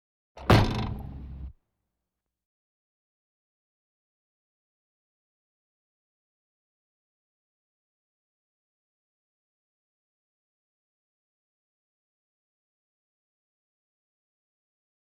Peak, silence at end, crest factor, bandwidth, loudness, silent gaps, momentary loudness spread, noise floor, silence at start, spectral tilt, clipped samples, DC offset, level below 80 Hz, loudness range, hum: -6 dBFS; 13.55 s; 30 dB; 15.5 kHz; -25 LUFS; none; 22 LU; -87 dBFS; 0.35 s; -6.5 dB/octave; under 0.1%; under 0.1%; -46 dBFS; 21 LU; none